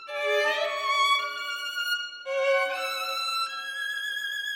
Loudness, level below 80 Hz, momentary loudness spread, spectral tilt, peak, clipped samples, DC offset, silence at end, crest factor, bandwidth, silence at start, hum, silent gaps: -27 LUFS; under -90 dBFS; 7 LU; 2.5 dB/octave; -14 dBFS; under 0.1%; under 0.1%; 0 s; 14 dB; 16.5 kHz; 0 s; none; none